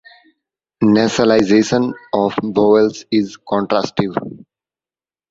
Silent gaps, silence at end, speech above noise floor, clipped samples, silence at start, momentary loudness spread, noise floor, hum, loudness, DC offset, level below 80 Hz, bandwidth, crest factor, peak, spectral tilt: none; 0.95 s; over 75 dB; under 0.1%; 0.8 s; 8 LU; under -90 dBFS; none; -16 LUFS; under 0.1%; -52 dBFS; 7.8 kHz; 16 dB; 0 dBFS; -5.5 dB/octave